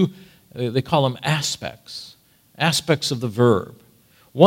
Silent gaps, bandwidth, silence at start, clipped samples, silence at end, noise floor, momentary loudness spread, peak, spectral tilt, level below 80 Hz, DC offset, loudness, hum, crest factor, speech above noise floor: none; 16.5 kHz; 0 s; under 0.1%; 0 s; -55 dBFS; 18 LU; 0 dBFS; -5 dB/octave; -58 dBFS; under 0.1%; -21 LUFS; none; 22 dB; 34 dB